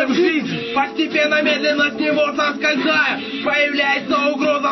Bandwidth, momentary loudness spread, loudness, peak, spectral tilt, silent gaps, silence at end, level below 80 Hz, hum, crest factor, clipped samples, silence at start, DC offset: 6.2 kHz; 4 LU; -17 LUFS; -6 dBFS; -4 dB/octave; none; 0 s; -62 dBFS; none; 12 dB; under 0.1%; 0 s; under 0.1%